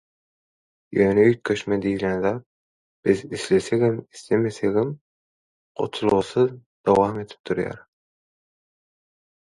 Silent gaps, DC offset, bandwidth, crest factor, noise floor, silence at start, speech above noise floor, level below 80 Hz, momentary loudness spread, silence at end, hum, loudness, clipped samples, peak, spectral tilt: 2.46-3.03 s, 5.01-5.75 s, 6.66-6.84 s, 7.39-7.44 s; under 0.1%; 11.5 kHz; 20 dB; under -90 dBFS; 0.9 s; over 69 dB; -56 dBFS; 12 LU; 1.75 s; none; -23 LUFS; under 0.1%; -4 dBFS; -6.5 dB/octave